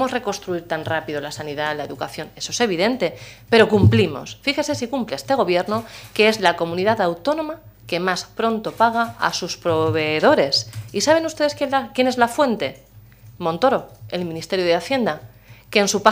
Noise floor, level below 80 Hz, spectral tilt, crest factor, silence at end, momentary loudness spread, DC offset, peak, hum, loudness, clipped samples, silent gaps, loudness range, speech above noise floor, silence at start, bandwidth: -45 dBFS; -52 dBFS; -4.5 dB/octave; 20 dB; 0 s; 12 LU; under 0.1%; 0 dBFS; none; -20 LUFS; under 0.1%; none; 3 LU; 25 dB; 0 s; 16 kHz